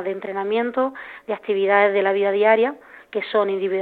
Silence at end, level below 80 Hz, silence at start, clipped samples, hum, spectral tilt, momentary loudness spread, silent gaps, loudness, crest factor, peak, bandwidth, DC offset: 0 s; -70 dBFS; 0 s; under 0.1%; none; -7 dB/octave; 13 LU; none; -20 LUFS; 18 dB; -4 dBFS; 4.5 kHz; under 0.1%